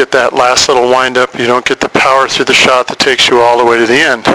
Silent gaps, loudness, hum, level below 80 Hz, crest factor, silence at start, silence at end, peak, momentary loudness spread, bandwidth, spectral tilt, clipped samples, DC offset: none; -8 LUFS; none; -42 dBFS; 8 dB; 0 s; 0 s; 0 dBFS; 5 LU; 11 kHz; -2.5 dB/octave; 0.9%; under 0.1%